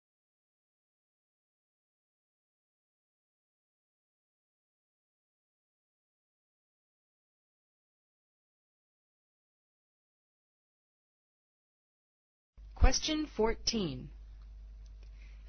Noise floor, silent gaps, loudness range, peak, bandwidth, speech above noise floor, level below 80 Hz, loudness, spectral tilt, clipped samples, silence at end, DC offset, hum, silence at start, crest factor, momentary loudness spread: -50 dBFS; none; 3 LU; -12 dBFS; 6.4 kHz; 20 dB; -44 dBFS; -33 LUFS; -4 dB/octave; under 0.1%; 0 s; under 0.1%; none; 12.6 s; 28 dB; 23 LU